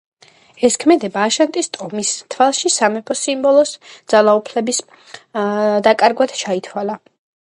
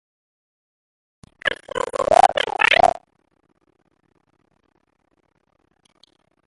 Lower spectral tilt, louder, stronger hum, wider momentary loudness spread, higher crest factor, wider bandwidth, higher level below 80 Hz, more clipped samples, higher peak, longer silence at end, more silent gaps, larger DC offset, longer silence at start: about the same, -3 dB/octave vs -2 dB/octave; about the same, -16 LUFS vs -18 LUFS; neither; about the same, 10 LU vs 12 LU; second, 16 dB vs 24 dB; about the same, 11.5 kHz vs 11.5 kHz; second, -64 dBFS vs -54 dBFS; neither; about the same, 0 dBFS vs 0 dBFS; second, 0.6 s vs 3.6 s; neither; neither; second, 0.6 s vs 1.45 s